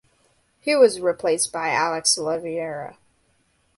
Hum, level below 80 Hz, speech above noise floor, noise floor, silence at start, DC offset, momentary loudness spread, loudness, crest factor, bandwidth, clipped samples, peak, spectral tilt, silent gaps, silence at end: none; -66 dBFS; 44 dB; -65 dBFS; 0.65 s; under 0.1%; 14 LU; -21 LUFS; 18 dB; 12 kHz; under 0.1%; -4 dBFS; -2 dB/octave; none; 0.85 s